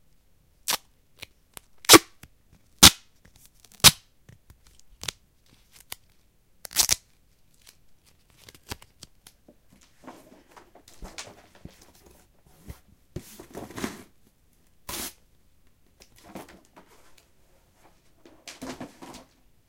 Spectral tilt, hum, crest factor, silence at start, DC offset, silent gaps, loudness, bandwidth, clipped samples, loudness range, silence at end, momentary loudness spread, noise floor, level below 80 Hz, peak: -1.5 dB/octave; none; 30 dB; 0.7 s; under 0.1%; none; -19 LUFS; 17 kHz; under 0.1%; 27 LU; 0.85 s; 31 LU; -63 dBFS; -52 dBFS; 0 dBFS